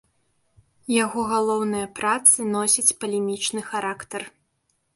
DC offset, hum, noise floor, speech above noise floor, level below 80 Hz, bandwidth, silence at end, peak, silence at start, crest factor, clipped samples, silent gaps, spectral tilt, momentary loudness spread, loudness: under 0.1%; none; -71 dBFS; 49 dB; -64 dBFS; 12 kHz; 0.65 s; -2 dBFS; 0.9 s; 24 dB; under 0.1%; none; -2 dB/octave; 17 LU; -21 LUFS